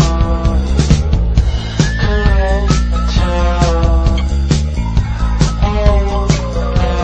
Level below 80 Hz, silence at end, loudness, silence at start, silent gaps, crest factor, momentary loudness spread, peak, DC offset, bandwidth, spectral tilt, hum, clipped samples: -14 dBFS; 0 s; -15 LUFS; 0 s; none; 12 dB; 3 LU; 0 dBFS; under 0.1%; 8.6 kHz; -6 dB/octave; none; 0.1%